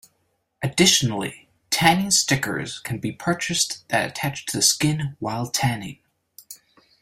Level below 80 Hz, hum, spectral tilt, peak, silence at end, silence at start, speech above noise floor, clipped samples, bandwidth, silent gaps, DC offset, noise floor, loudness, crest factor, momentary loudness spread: -54 dBFS; none; -3 dB/octave; -2 dBFS; 0.45 s; 0.6 s; 48 dB; under 0.1%; 16 kHz; none; under 0.1%; -70 dBFS; -21 LUFS; 22 dB; 14 LU